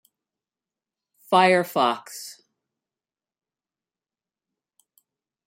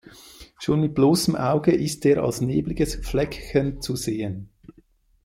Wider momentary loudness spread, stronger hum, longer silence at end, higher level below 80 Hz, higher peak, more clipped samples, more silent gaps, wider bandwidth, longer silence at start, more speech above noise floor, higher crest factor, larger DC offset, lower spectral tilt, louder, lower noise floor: first, 20 LU vs 9 LU; neither; first, 3.15 s vs 0.55 s; second, -78 dBFS vs -40 dBFS; about the same, -4 dBFS vs -6 dBFS; neither; neither; about the same, 16 kHz vs 16.5 kHz; first, 1.3 s vs 0.05 s; first, over 69 dB vs 36 dB; first, 24 dB vs 18 dB; neither; second, -4 dB/octave vs -6 dB/octave; about the same, -21 LUFS vs -23 LUFS; first, under -90 dBFS vs -58 dBFS